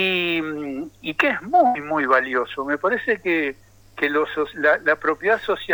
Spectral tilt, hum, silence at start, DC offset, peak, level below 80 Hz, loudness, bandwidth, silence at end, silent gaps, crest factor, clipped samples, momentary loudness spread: -5.5 dB/octave; none; 0 s; under 0.1%; -4 dBFS; -58 dBFS; -21 LUFS; 19.5 kHz; 0 s; none; 16 dB; under 0.1%; 9 LU